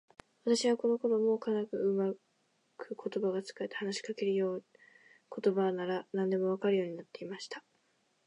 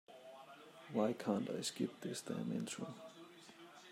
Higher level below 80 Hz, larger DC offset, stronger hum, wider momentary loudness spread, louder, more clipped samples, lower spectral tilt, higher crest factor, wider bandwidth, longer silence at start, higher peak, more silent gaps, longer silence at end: about the same, -86 dBFS vs -88 dBFS; neither; neither; second, 14 LU vs 19 LU; first, -33 LUFS vs -42 LUFS; neither; about the same, -5.5 dB/octave vs -5 dB/octave; about the same, 16 dB vs 20 dB; second, 11 kHz vs 16 kHz; first, 0.45 s vs 0.1 s; first, -18 dBFS vs -24 dBFS; neither; first, 0.65 s vs 0 s